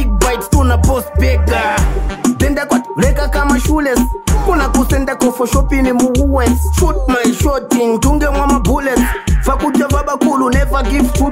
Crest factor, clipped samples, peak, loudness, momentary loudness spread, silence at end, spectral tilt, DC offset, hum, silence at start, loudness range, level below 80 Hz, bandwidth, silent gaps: 12 dB; under 0.1%; 0 dBFS; -14 LUFS; 3 LU; 0 s; -5.5 dB/octave; under 0.1%; none; 0 s; 1 LU; -16 dBFS; 16.5 kHz; none